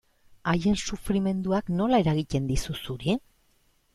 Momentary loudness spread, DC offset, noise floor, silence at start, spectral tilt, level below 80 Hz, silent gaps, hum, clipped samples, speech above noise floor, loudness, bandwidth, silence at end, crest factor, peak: 8 LU; under 0.1%; -66 dBFS; 0.45 s; -6 dB/octave; -42 dBFS; none; none; under 0.1%; 40 dB; -27 LUFS; 13.5 kHz; 0.75 s; 18 dB; -10 dBFS